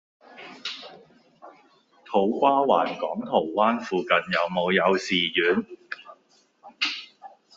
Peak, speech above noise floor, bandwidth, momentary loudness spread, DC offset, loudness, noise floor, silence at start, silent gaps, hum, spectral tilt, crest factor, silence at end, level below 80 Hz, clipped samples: -6 dBFS; 39 dB; 7.8 kHz; 18 LU; under 0.1%; -24 LUFS; -62 dBFS; 0.3 s; none; none; -4.5 dB/octave; 20 dB; 0.3 s; -70 dBFS; under 0.1%